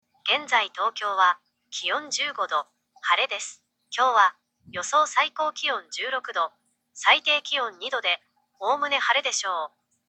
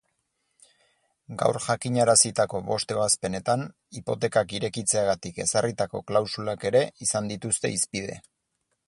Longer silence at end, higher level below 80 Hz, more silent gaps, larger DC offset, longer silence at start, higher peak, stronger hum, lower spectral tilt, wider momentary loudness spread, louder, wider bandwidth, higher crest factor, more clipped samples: second, 0.4 s vs 0.7 s; second, -82 dBFS vs -58 dBFS; neither; neither; second, 0.25 s vs 1.3 s; about the same, -4 dBFS vs -6 dBFS; neither; second, 1 dB/octave vs -3.5 dB/octave; about the same, 12 LU vs 10 LU; about the same, -24 LUFS vs -25 LUFS; second, 9 kHz vs 11.5 kHz; about the same, 22 dB vs 22 dB; neither